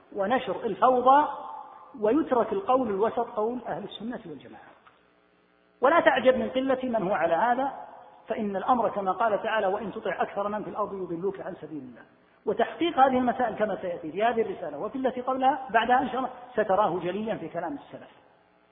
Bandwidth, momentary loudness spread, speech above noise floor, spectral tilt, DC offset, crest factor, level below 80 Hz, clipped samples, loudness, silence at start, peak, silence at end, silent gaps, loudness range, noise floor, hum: 3.9 kHz; 16 LU; 37 dB; -9.5 dB/octave; under 0.1%; 22 dB; -64 dBFS; under 0.1%; -26 LUFS; 0.1 s; -4 dBFS; 0.65 s; none; 5 LU; -64 dBFS; none